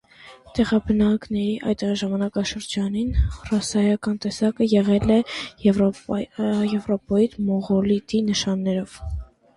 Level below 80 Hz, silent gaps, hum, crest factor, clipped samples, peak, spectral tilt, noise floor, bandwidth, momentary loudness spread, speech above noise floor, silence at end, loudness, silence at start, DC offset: -36 dBFS; none; none; 16 dB; under 0.1%; -6 dBFS; -6 dB/octave; -47 dBFS; 11.5 kHz; 7 LU; 25 dB; 0.35 s; -22 LUFS; 0.25 s; under 0.1%